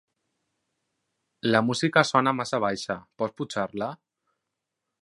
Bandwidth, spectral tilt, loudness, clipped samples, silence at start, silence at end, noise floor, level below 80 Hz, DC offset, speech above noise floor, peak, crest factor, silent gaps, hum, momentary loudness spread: 11.5 kHz; -5 dB/octave; -26 LUFS; under 0.1%; 1.45 s; 1.1 s; -84 dBFS; -68 dBFS; under 0.1%; 59 dB; -4 dBFS; 24 dB; none; none; 12 LU